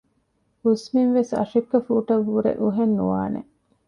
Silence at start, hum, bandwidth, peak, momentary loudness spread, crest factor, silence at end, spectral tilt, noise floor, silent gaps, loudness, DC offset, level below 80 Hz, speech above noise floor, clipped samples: 0.65 s; none; 10.5 kHz; -6 dBFS; 6 LU; 16 dB; 0.45 s; -8 dB/octave; -68 dBFS; none; -22 LUFS; under 0.1%; -58 dBFS; 47 dB; under 0.1%